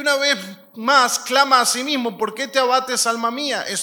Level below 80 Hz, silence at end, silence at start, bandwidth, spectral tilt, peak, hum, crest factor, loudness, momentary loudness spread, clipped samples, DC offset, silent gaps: -76 dBFS; 0 s; 0 s; 19 kHz; -1 dB/octave; 0 dBFS; none; 18 dB; -18 LUFS; 9 LU; under 0.1%; under 0.1%; none